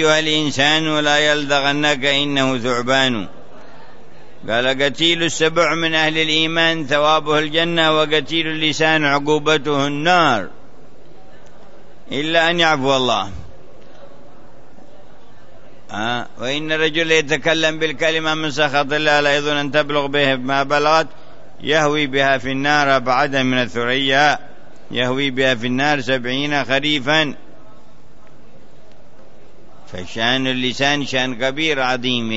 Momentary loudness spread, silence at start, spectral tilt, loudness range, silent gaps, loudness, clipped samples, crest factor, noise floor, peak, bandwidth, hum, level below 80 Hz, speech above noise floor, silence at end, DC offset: 7 LU; 0 s; -3.5 dB/octave; 7 LU; none; -17 LUFS; under 0.1%; 16 dB; -48 dBFS; -2 dBFS; 8 kHz; none; -54 dBFS; 30 dB; 0 s; 4%